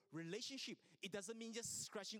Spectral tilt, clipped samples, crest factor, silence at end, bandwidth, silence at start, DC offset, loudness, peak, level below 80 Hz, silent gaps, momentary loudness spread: -2.5 dB/octave; under 0.1%; 16 dB; 0 s; 19 kHz; 0.1 s; under 0.1%; -49 LUFS; -34 dBFS; -88 dBFS; none; 5 LU